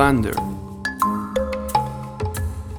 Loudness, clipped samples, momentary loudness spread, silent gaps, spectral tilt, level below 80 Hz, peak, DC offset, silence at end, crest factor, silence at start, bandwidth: -24 LUFS; under 0.1%; 7 LU; none; -6 dB/octave; -36 dBFS; -2 dBFS; under 0.1%; 0 s; 20 dB; 0 s; over 20 kHz